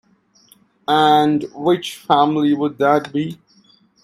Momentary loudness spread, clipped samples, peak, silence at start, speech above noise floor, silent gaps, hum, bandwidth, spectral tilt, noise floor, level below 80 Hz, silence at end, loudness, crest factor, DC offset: 11 LU; under 0.1%; 0 dBFS; 0.9 s; 38 dB; none; none; 15 kHz; -6 dB/octave; -54 dBFS; -62 dBFS; 0.7 s; -17 LUFS; 18 dB; under 0.1%